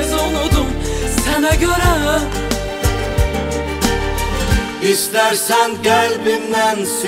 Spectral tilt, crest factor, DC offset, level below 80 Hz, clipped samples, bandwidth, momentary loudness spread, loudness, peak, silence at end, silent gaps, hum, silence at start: -4 dB/octave; 14 dB; under 0.1%; -24 dBFS; under 0.1%; 16 kHz; 6 LU; -16 LUFS; -2 dBFS; 0 s; none; none; 0 s